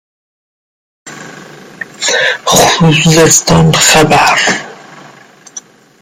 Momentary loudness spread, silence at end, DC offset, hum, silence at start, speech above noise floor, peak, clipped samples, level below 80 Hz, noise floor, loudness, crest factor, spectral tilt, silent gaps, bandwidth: 23 LU; 0.4 s; under 0.1%; none; 1.05 s; 30 dB; 0 dBFS; 0.1%; -38 dBFS; -38 dBFS; -7 LUFS; 12 dB; -3 dB/octave; none; over 20 kHz